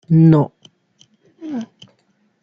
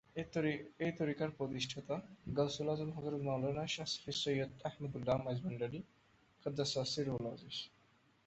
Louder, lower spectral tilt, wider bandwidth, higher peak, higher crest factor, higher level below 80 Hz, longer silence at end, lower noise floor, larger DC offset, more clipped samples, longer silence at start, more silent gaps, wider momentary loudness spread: first, -16 LUFS vs -40 LUFS; first, -10.5 dB/octave vs -5 dB/octave; second, 6.2 kHz vs 8.2 kHz; first, -2 dBFS vs -22 dBFS; about the same, 16 dB vs 18 dB; first, -56 dBFS vs -68 dBFS; first, 0.8 s vs 0.6 s; second, -62 dBFS vs -71 dBFS; neither; neither; about the same, 0.1 s vs 0.15 s; neither; first, 25 LU vs 7 LU